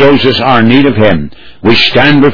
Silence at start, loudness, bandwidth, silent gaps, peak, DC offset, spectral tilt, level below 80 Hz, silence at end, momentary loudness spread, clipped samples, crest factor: 0 s; -7 LUFS; 5.4 kHz; none; 0 dBFS; 10%; -7 dB/octave; -34 dBFS; 0 s; 9 LU; 3%; 8 dB